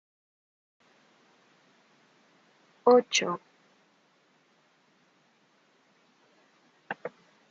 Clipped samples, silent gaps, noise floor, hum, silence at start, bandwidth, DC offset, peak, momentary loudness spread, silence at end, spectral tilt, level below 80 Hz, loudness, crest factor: under 0.1%; none; -67 dBFS; none; 2.85 s; 7.6 kHz; under 0.1%; -8 dBFS; 19 LU; 0.45 s; -1.5 dB/octave; -90 dBFS; -27 LUFS; 26 dB